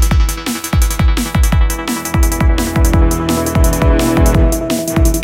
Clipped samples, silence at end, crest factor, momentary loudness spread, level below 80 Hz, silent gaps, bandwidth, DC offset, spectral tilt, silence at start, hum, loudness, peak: under 0.1%; 0 s; 12 dB; 5 LU; -14 dBFS; none; 16.5 kHz; under 0.1%; -5.5 dB/octave; 0 s; none; -14 LUFS; 0 dBFS